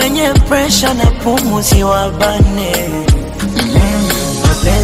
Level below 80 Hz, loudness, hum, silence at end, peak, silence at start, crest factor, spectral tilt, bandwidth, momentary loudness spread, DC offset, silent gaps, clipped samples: -18 dBFS; -12 LUFS; none; 0 s; 0 dBFS; 0 s; 12 dB; -4.5 dB/octave; 16.5 kHz; 4 LU; under 0.1%; none; under 0.1%